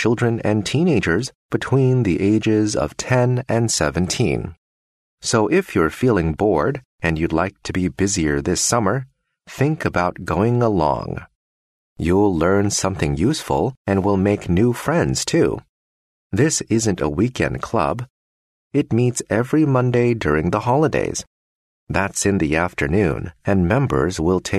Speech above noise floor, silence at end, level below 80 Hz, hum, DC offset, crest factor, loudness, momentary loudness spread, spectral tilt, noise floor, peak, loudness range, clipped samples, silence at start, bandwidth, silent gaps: over 72 dB; 0 s; -40 dBFS; none; under 0.1%; 16 dB; -19 LUFS; 6 LU; -5.5 dB/octave; under -90 dBFS; -2 dBFS; 2 LU; under 0.1%; 0 s; 13.5 kHz; 1.35-1.49 s, 4.58-5.18 s, 6.85-6.98 s, 11.35-11.96 s, 13.77-13.85 s, 15.69-16.30 s, 18.10-18.71 s, 21.27-21.87 s